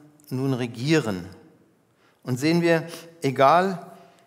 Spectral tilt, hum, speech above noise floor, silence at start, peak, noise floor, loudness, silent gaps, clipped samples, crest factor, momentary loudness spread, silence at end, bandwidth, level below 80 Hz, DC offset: -6 dB/octave; none; 39 dB; 0.3 s; -4 dBFS; -62 dBFS; -23 LUFS; none; under 0.1%; 20 dB; 18 LU; 0.3 s; 16 kHz; -70 dBFS; under 0.1%